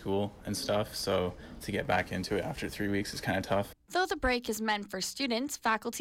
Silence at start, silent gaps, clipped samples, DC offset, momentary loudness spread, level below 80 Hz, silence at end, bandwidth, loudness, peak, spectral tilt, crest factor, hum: 0 s; none; under 0.1%; under 0.1%; 5 LU; -52 dBFS; 0 s; 17 kHz; -32 LUFS; -18 dBFS; -4 dB/octave; 14 dB; none